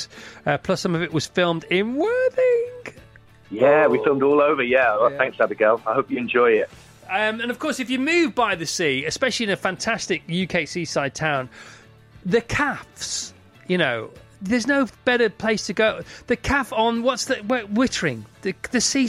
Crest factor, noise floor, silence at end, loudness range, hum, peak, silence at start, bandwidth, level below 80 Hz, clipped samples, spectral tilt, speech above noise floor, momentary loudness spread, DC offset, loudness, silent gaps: 18 dB; -49 dBFS; 0 s; 6 LU; none; -4 dBFS; 0 s; 15 kHz; -50 dBFS; under 0.1%; -4 dB/octave; 27 dB; 11 LU; under 0.1%; -21 LUFS; none